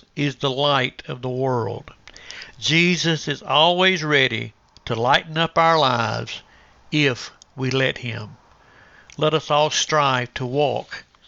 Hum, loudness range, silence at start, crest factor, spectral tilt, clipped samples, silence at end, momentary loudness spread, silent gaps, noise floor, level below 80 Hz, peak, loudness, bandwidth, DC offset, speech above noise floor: none; 5 LU; 0.15 s; 20 dB; -4 dB/octave; under 0.1%; 0.25 s; 19 LU; none; -51 dBFS; -56 dBFS; -2 dBFS; -20 LUFS; 8 kHz; under 0.1%; 31 dB